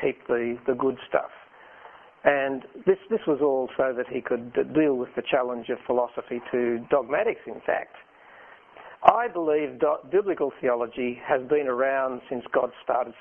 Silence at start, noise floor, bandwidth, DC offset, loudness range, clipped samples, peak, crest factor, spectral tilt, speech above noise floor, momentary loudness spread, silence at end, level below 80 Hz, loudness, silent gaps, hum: 0 s; -50 dBFS; 3.6 kHz; under 0.1%; 2 LU; under 0.1%; 0 dBFS; 26 dB; -8.5 dB/octave; 25 dB; 7 LU; 0.1 s; -64 dBFS; -26 LUFS; none; none